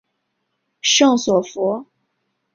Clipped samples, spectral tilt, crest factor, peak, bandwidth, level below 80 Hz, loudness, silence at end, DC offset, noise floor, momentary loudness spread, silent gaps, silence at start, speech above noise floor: under 0.1%; -2.5 dB/octave; 18 dB; -2 dBFS; 7.6 kHz; -64 dBFS; -17 LUFS; 0.7 s; under 0.1%; -73 dBFS; 9 LU; none; 0.85 s; 57 dB